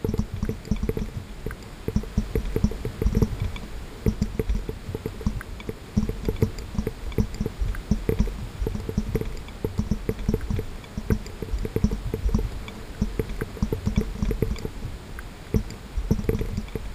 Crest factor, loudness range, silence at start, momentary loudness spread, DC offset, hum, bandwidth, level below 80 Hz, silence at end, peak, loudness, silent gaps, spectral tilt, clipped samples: 20 dB; 1 LU; 0 s; 9 LU; under 0.1%; none; 15.5 kHz; -30 dBFS; 0 s; -6 dBFS; -29 LUFS; none; -7 dB/octave; under 0.1%